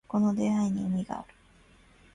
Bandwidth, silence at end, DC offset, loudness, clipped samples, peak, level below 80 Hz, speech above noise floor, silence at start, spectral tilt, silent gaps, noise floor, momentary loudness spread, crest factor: 10.5 kHz; 0.9 s; under 0.1%; -29 LUFS; under 0.1%; -16 dBFS; -60 dBFS; 31 dB; 0.1 s; -7.5 dB/octave; none; -59 dBFS; 11 LU; 14 dB